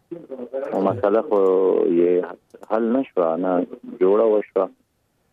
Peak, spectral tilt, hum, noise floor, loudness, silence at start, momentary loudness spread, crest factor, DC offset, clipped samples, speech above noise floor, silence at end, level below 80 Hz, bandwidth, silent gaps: -6 dBFS; -9.5 dB/octave; none; -67 dBFS; -20 LUFS; 0.1 s; 13 LU; 14 dB; under 0.1%; under 0.1%; 48 dB; 0.65 s; -70 dBFS; 4.1 kHz; none